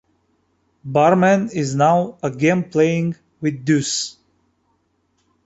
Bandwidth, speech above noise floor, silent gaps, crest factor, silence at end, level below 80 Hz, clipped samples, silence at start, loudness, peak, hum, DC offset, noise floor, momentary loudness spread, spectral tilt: 8.2 kHz; 49 dB; none; 18 dB; 1.35 s; -60 dBFS; under 0.1%; 0.85 s; -18 LUFS; -2 dBFS; none; under 0.1%; -66 dBFS; 10 LU; -5.5 dB/octave